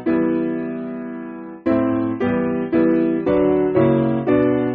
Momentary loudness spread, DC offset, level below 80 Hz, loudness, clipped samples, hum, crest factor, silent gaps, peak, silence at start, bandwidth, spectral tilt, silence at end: 12 LU; under 0.1%; -48 dBFS; -19 LUFS; under 0.1%; none; 14 dB; none; -4 dBFS; 0 s; 4.3 kHz; -8 dB/octave; 0 s